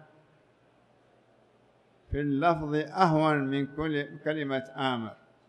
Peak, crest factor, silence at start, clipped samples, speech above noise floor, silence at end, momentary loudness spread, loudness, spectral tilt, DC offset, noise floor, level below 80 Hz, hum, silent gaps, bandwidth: -8 dBFS; 22 dB; 2.1 s; under 0.1%; 36 dB; 0.35 s; 9 LU; -29 LUFS; -7.5 dB/octave; under 0.1%; -64 dBFS; -52 dBFS; none; none; 9.6 kHz